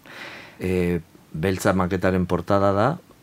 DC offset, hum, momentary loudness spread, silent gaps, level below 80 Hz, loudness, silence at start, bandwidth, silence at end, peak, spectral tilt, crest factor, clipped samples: under 0.1%; none; 17 LU; none; -48 dBFS; -23 LUFS; 0.05 s; 16 kHz; 0.2 s; -4 dBFS; -6.5 dB/octave; 20 dB; under 0.1%